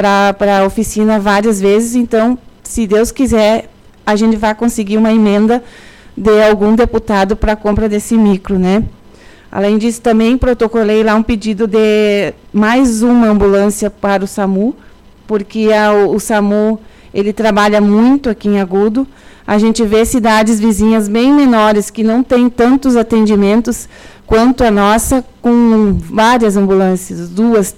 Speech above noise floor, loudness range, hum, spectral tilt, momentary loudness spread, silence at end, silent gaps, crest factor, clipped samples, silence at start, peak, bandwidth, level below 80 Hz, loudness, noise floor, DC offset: 28 dB; 3 LU; none; -5.5 dB/octave; 7 LU; 0.05 s; none; 8 dB; under 0.1%; 0 s; -2 dBFS; 15.5 kHz; -30 dBFS; -11 LUFS; -38 dBFS; under 0.1%